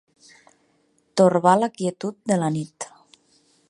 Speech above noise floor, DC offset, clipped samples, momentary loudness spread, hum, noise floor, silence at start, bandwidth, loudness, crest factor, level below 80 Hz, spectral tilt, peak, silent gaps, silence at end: 45 dB; under 0.1%; under 0.1%; 18 LU; none; -65 dBFS; 1.15 s; 11.5 kHz; -21 LUFS; 22 dB; -68 dBFS; -6 dB/octave; -2 dBFS; none; 0.85 s